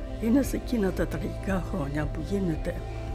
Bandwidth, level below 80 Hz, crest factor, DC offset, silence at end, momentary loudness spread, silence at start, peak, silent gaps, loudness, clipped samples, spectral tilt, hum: 16 kHz; -36 dBFS; 14 dB; under 0.1%; 0 s; 7 LU; 0 s; -14 dBFS; none; -29 LUFS; under 0.1%; -7 dB/octave; none